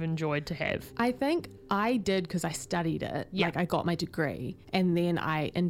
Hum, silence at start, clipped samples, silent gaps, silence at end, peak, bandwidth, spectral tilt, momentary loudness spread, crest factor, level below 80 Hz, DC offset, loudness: none; 0 s; under 0.1%; none; 0 s; -12 dBFS; 16 kHz; -6 dB/octave; 5 LU; 18 dB; -56 dBFS; under 0.1%; -30 LUFS